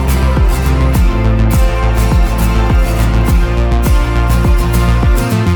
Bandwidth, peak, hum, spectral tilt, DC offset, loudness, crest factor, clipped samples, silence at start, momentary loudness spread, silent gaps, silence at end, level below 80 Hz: over 20 kHz; 0 dBFS; none; -6.5 dB/octave; under 0.1%; -12 LUFS; 8 dB; under 0.1%; 0 s; 1 LU; none; 0 s; -12 dBFS